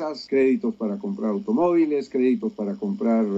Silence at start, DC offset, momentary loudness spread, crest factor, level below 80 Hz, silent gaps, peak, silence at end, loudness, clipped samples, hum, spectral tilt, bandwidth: 0 s; under 0.1%; 8 LU; 12 dB; -68 dBFS; none; -10 dBFS; 0 s; -23 LUFS; under 0.1%; none; -8 dB/octave; 7.8 kHz